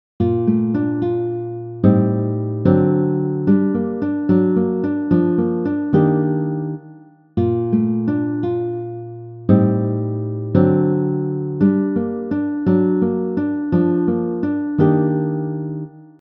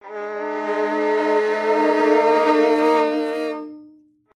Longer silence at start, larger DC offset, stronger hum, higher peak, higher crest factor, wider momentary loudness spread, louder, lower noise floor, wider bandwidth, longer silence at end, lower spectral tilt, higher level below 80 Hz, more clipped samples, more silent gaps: first, 0.2 s vs 0.05 s; neither; neither; first, 0 dBFS vs -4 dBFS; about the same, 18 dB vs 16 dB; second, 9 LU vs 12 LU; about the same, -18 LUFS vs -19 LUFS; second, -43 dBFS vs -51 dBFS; second, 4.1 kHz vs 11 kHz; second, 0.15 s vs 0.5 s; first, -12.5 dB/octave vs -4.5 dB/octave; first, -54 dBFS vs -70 dBFS; neither; neither